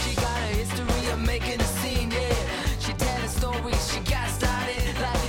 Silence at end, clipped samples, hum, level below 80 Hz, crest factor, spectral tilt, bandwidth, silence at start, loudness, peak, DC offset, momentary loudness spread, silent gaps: 0 s; under 0.1%; none; -30 dBFS; 12 dB; -4 dB/octave; 17 kHz; 0 s; -26 LUFS; -14 dBFS; under 0.1%; 2 LU; none